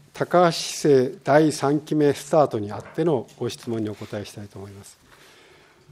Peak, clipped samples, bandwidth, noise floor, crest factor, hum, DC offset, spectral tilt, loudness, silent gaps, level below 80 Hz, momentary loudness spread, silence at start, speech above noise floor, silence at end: -4 dBFS; under 0.1%; 15.5 kHz; -53 dBFS; 20 dB; none; under 0.1%; -5.5 dB/octave; -22 LUFS; none; -66 dBFS; 16 LU; 0.15 s; 31 dB; 1 s